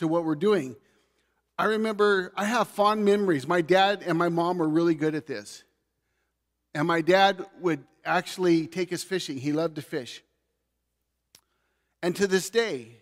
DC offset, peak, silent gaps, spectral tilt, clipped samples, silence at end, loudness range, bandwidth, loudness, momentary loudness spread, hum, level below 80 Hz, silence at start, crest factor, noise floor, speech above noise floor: under 0.1%; -8 dBFS; none; -5 dB/octave; under 0.1%; 0.1 s; 7 LU; 15.5 kHz; -25 LUFS; 13 LU; none; -74 dBFS; 0 s; 20 dB; -79 dBFS; 54 dB